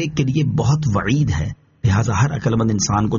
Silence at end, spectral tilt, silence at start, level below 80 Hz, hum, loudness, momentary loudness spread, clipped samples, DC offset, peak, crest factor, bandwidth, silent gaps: 0 s; -6.5 dB/octave; 0 s; -38 dBFS; none; -19 LUFS; 4 LU; under 0.1%; under 0.1%; -6 dBFS; 12 dB; 7.4 kHz; none